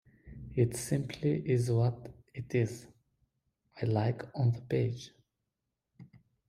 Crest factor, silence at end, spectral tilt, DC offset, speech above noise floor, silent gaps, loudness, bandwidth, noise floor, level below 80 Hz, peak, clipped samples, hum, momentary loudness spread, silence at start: 20 dB; 0.3 s; -7 dB/octave; under 0.1%; 55 dB; none; -32 LUFS; 14.5 kHz; -86 dBFS; -62 dBFS; -14 dBFS; under 0.1%; none; 17 LU; 0.25 s